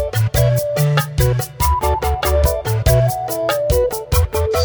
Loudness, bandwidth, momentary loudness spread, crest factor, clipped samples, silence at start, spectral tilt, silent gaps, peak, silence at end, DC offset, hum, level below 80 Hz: -17 LUFS; over 20 kHz; 3 LU; 14 dB; under 0.1%; 0 s; -5.5 dB/octave; none; -2 dBFS; 0 s; under 0.1%; none; -22 dBFS